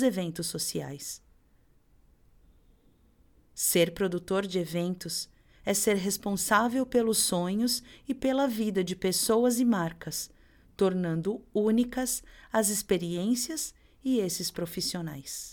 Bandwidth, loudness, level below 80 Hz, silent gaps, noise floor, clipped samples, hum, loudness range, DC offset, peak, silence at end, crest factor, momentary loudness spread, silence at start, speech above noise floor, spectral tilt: 19 kHz; -29 LUFS; -58 dBFS; none; -63 dBFS; under 0.1%; none; 6 LU; under 0.1%; -10 dBFS; 0 s; 20 dB; 12 LU; 0 s; 34 dB; -4 dB/octave